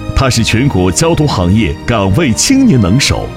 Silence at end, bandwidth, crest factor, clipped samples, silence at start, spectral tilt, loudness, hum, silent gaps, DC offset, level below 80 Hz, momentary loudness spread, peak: 0 s; 16 kHz; 10 dB; 0.2%; 0 s; -5 dB/octave; -10 LUFS; none; none; 0.2%; -24 dBFS; 4 LU; 0 dBFS